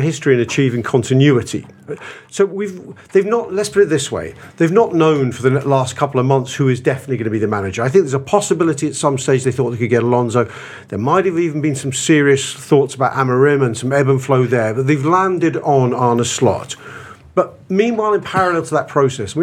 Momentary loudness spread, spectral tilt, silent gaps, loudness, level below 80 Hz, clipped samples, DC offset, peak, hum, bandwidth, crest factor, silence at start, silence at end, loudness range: 11 LU; -6 dB/octave; none; -16 LUFS; -56 dBFS; under 0.1%; under 0.1%; 0 dBFS; none; 13 kHz; 16 dB; 0 s; 0 s; 3 LU